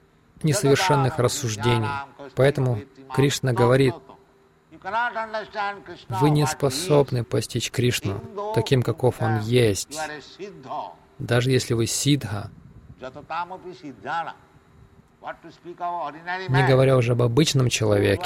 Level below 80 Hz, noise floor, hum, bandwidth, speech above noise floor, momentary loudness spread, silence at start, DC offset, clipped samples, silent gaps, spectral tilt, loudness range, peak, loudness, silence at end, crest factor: -52 dBFS; -57 dBFS; none; 16 kHz; 35 dB; 19 LU; 0.4 s; under 0.1%; under 0.1%; none; -5.5 dB/octave; 8 LU; -6 dBFS; -23 LUFS; 0 s; 18 dB